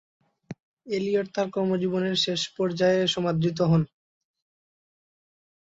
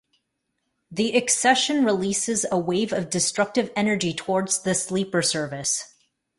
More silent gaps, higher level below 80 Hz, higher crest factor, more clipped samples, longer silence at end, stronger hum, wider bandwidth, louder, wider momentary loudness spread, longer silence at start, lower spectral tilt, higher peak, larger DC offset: first, 0.63-0.77 s vs none; about the same, -62 dBFS vs -62 dBFS; about the same, 18 dB vs 18 dB; neither; first, 1.9 s vs 0.5 s; neither; second, 8 kHz vs 11.5 kHz; about the same, -25 LUFS vs -23 LUFS; first, 16 LU vs 6 LU; second, 0.5 s vs 0.9 s; first, -5.5 dB/octave vs -3 dB/octave; second, -10 dBFS vs -6 dBFS; neither